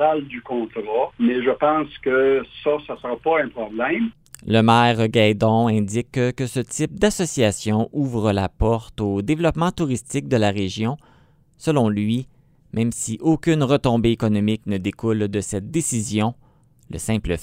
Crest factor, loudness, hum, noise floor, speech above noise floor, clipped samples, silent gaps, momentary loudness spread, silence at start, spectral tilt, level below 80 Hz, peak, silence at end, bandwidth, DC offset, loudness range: 18 dB; -21 LUFS; none; -54 dBFS; 34 dB; under 0.1%; none; 9 LU; 0 s; -5.5 dB/octave; -42 dBFS; -2 dBFS; 0 s; 16 kHz; under 0.1%; 4 LU